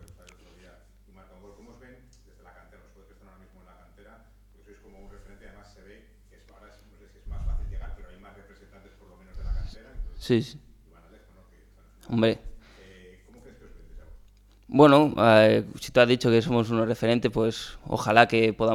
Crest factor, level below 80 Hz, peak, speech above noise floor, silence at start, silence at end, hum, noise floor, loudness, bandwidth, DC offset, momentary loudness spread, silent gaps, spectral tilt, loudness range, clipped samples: 26 dB; -42 dBFS; -2 dBFS; 33 dB; 5.05 s; 0 s; 50 Hz at -55 dBFS; -56 dBFS; -23 LUFS; 15.5 kHz; under 0.1%; 23 LU; none; -6 dB/octave; 22 LU; under 0.1%